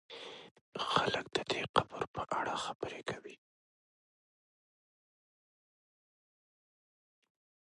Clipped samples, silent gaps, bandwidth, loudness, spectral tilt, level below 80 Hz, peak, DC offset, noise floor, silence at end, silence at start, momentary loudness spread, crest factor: under 0.1%; 0.51-0.55 s, 0.61-0.72 s, 1.69-1.74 s, 2.07-2.14 s, 2.75-2.80 s; 11.5 kHz; -36 LUFS; -3.5 dB/octave; -70 dBFS; -10 dBFS; under 0.1%; under -90 dBFS; 4.4 s; 0.1 s; 16 LU; 30 dB